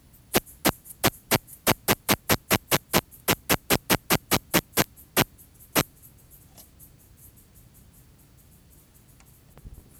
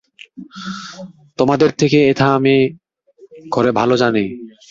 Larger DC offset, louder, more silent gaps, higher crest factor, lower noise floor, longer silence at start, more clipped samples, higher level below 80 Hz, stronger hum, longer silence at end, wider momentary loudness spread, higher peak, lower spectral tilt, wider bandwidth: neither; second, -25 LUFS vs -15 LUFS; neither; first, 26 dB vs 16 dB; first, -55 dBFS vs -48 dBFS; about the same, 0.35 s vs 0.4 s; neither; first, -48 dBFS vs -54 dBFS; neither; about the same, 0.3 s vs 0.2 s; second, 4 LU vs 20 LU; about the same, -2 dBFS vs -2 dBFS; second, -3 dB/octave vs -6 dB/octave; first, over 20 kHz vs 7.6 kHz